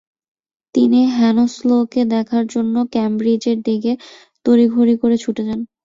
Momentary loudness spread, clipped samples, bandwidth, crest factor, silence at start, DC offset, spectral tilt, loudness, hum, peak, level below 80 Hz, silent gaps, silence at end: 9 LU; under 0.1%; 7.6 kHz; 14 dB; 0.75 s; under 0.1%; -6.5 dB/octave; -16 LUFS; none; -2 dBFS; -58 dBFS; none; 0.2 s